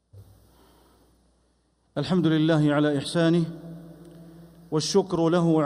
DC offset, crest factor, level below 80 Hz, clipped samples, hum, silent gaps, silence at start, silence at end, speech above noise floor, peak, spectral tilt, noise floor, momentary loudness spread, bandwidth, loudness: under 0.1%; 14 dB; -60 dBFS; under 0.1%; none; none; 0.15 s; 0 s; 45 dB; -10 dBFS; -6 dB/octave; -67 dBFS; 15 LU; 13.5 kHz; -24 LUFS